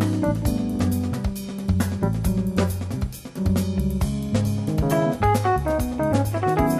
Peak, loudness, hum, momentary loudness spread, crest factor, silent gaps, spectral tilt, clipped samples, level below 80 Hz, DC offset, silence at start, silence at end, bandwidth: -6 dBFS; -23 LUFS; none; 7 LU; 16 dB; none; -7 dB/octave; under 0.1%; -32 dBFS; under 0.1%; 0 s; 0 s; 15 kHz